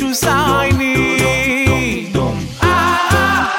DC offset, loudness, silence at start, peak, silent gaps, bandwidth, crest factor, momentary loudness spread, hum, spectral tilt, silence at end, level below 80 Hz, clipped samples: under 0.1%; -14 LUFS; 0 s; -2 dBFS; none; 17 kHz; 14 dB; 5 LU; none; -4.5 dB/octave; 0 s; -32 dBFS; under 0.1%